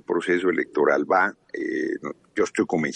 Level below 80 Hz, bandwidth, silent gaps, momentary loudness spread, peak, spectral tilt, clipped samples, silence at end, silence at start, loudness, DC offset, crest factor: -68 dBFS; 9.8 kHz; none; 10 LU; -6 dBFS; -5.5 dB/octave; under 0.1%; 0 s; 0.1 s; -24 LUFS; under 0.1%; 16 dB